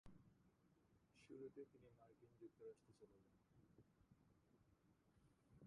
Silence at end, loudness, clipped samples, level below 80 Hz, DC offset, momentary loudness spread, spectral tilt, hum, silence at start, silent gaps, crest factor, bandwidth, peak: 0 s; -63 LUFS; under 0.1%; -84 dBFS; under 0.1%; 7 LU; -7 dB/octave; none; 0.05 s; none; 20 dB; 6.6 kHz; -48 dBFS